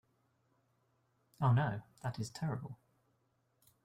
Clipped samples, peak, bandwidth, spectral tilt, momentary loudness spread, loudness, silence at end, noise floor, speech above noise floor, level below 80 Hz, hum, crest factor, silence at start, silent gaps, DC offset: under 0.1%; -20 dBFS; 12 kHz; -7 dB/octave; 16 LU; -37 LUFS; 1.1 s; -78 dBFS; 42 dB; -70 dBFS; none; 20 dB; 1.4 s; none; under 0.1%